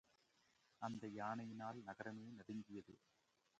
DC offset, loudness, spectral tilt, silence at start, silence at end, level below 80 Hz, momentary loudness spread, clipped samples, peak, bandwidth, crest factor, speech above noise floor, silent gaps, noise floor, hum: under 0.1%; -52 LUFS; -6.5 dB/octave; 0.8 s; 0.6 s; -86 dBFS; 9 LU; under 0.1%; -32 dBFS; 8.8 kHz; 22 dB; 28 dB; none; -80 dBFS; none